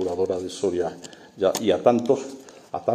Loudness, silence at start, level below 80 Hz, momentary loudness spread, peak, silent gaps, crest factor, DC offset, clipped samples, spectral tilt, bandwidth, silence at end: -24 LUFS; 0 s; -62 dBFS; 20 LU; -4 dBFS; none; 20 dB; under 0.1%; under 0.1%; -5 dB/octave; 15.5 kHz; 0 s